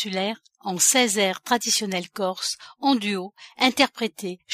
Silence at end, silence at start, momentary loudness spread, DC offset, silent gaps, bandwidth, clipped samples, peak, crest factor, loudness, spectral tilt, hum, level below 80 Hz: 0 s; 0 s; 13 LU; under 0.1%; none; 15.5 kHz; under 0.1%; -4 dBFS; 20 dB; -22 LUFS; -2 dB/octave; none; -70 dBFS